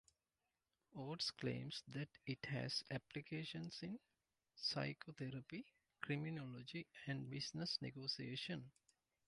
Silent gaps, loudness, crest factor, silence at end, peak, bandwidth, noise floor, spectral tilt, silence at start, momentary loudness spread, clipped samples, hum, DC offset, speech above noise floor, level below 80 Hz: none; -48 LUFS; 20 dB; 0.55 s; -28 dBFS; 11 kHz; under -90 dBFS; -5 dB/octave; 0.9 s; 10 LU; under 0.1%; none; under 0.1%; over 42 dB; -80 dBFS